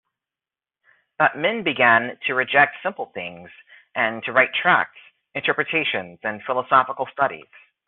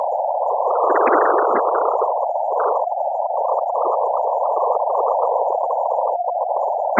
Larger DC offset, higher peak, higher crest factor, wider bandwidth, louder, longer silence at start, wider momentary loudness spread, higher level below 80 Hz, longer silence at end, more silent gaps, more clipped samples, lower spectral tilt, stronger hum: neither; about the same, -2 dBFS vs -2 dBFS; about the same, 20 dB vs 16 dB; second, 4.2 kHz vs 7.2 kHz; about the same, -20 LUFS vs -19 LUFS; first, 1.2 s vs 0 s; first, 14 LU vs 5 LU; first, -68 dBFS vs under -90 dBFS; first, 0.5 s vs 0 s; neither; neither; second, -1 dB/octave vs -8 dB/octave; neither